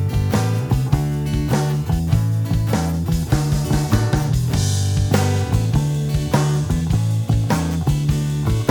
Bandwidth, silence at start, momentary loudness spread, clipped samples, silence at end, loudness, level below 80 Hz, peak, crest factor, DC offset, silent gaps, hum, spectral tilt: 19.5 kHz; 0 s; 2 LU; under 0.1%; 0 s; -19 LUFS; -28 dBFS; -2 dBFS; 16 dB; under 0.1%; none; none; -6.5 dB/octave